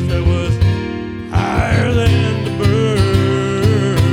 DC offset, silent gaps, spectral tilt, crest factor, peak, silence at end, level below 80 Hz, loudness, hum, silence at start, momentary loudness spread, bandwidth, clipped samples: 0.3%; none; -7 dB/octave; 14 dB; 0 dBFS; 0 s; -28 dBFS; -15 LUFS; none; 0 s; 6 LU; 13 kHz; under 0.1%